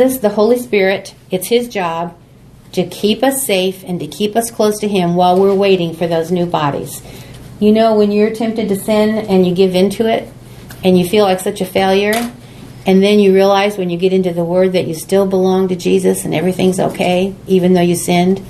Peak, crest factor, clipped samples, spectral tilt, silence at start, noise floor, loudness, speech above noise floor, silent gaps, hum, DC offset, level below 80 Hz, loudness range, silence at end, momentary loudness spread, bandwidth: 0 dBFS; 14 dB; under 0.1%; -5.5 dB/octave; 0 s; -41 dBFS; -14 LUFS; 28 dB; none; none; under 0.1%; -46 dBFS; 4 LU; 0 s; 10 LU; 14 kHz